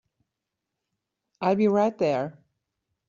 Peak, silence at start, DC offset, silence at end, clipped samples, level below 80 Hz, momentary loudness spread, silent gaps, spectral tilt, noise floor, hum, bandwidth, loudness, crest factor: -10 dBFS; 1.4 s; under 0.1%; 0.75 s; under 0.1%; -70 dBFS; 8 LU; none; -6.5 dB/octave; -85 dBFS; none; 7.4 kHz; -24 LUFS; 18 dB